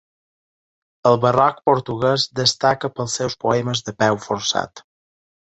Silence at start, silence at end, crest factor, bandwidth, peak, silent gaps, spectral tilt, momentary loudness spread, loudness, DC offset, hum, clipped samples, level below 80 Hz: 1.05 s; 0.8 s; 20 dB; 8.2 kHz; -2 dBFS; none; -4 dB/octave; 7 LU; -19 LUFS; under 0.1%; none; under 0.1%; -56 dBFS